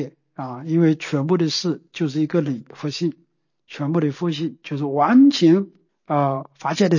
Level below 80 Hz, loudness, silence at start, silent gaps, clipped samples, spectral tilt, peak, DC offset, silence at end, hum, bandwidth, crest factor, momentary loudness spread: -72 dBFS; -20 LUFS; 0 s; none; under 0.1%; -6.5 dB/octave; -6 dBFS; under 0.1%; 0 s; none; 7.4 kHz; 14 dB; 15 LU